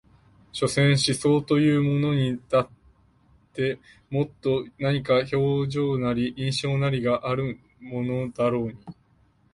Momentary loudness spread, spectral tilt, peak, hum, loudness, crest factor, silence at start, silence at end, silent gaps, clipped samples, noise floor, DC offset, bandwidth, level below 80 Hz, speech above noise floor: 12 LU; -6 dB/octave; -10 dBFS; none; -24 LUFS; 16 dB; 0.55 s; 0.6 s; none; under 0.1%; -62 dBFS; under 0.1%; 11.5 kHz; -54 dBFS; 38 dB